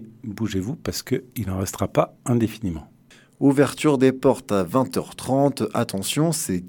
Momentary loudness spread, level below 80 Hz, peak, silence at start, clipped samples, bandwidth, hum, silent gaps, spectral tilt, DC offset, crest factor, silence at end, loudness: 10 LU; -54 dBFS; -4 dBFS; 0 s; under 0.1%; 18 kHz; none; none; -5.5 dB/octave; under 0.1%; 20 dB; 0 s; -23 LUFS